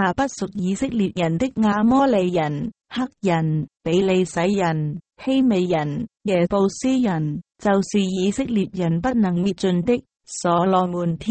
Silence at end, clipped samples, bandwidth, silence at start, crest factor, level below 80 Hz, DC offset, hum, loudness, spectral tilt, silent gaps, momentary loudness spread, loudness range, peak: 0 s; under 0.1%; 8.8 kHz; 0 s; 14 dB; -50 dBFS; under 0.1%; none; -21 LUFS; -6.5 dB/octave; none; 8 LU; 1 LU; -6 dBFS